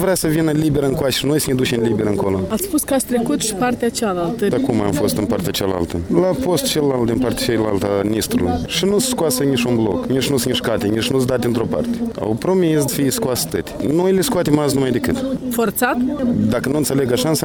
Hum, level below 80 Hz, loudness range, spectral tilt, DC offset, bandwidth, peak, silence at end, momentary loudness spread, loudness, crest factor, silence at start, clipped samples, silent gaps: none; -40 dBFS; 1 LU; -5 dB/octave; under 0.1%; 19.5 kHz; -2 dBFS; 0 s; 4 LU; -18 LUFS; 16 dB; 0 s; under 0.1%; none